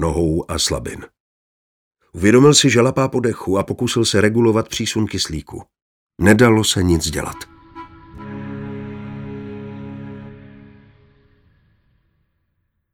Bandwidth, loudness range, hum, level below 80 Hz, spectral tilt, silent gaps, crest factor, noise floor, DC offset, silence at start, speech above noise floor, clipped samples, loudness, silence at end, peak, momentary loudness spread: 19 kHz; 19 LU; none; -40 dBFS; -4.5 dB/octave; 1.20-1.91 s, 5.82-6.07 s; 18 dB; -70 dBFS; under 0.1%; 0 s; 54 dB; under 0.1%; -16 LUFS; 2.45 s; 0 dBFS; 25 LU